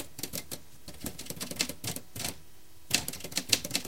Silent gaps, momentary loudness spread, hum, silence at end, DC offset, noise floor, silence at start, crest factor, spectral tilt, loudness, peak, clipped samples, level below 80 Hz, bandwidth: none; 15 LU; none; 0 s; 0.6%; -57 dBFS; 0 s; 32 dB; -1.5 dB/octave; -33 LUFS; -4 dBFS; under 0.1%; -58 dBFS; 17 kHz